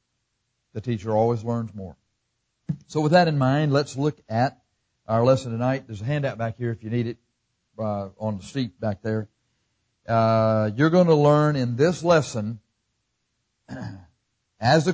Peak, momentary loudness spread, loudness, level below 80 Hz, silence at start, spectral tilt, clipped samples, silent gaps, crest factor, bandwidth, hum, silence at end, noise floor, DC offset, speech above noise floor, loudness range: -6 dBFS; 18 LU; -23 LUFS; -56 dBFS; 0.75 s; -7 dB/octave; under 0.1%; none; 18 dB; 8 kHz; none; 0 s; -76 dBFS; under 0.1%; 54 dB; 8 LU